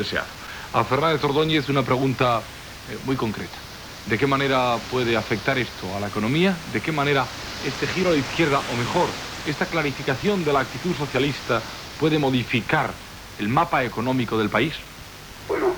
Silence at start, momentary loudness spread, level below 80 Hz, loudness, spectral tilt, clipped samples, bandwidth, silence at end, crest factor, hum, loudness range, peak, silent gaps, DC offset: 0 s; 13 LU; -48 dBFS; -23 LUFS; -5.5 dB/octave; under 0.1%; over 20 kHz; 0 s; 20 dB; none; 1 LU; -4 dBFS; none; under 0.1%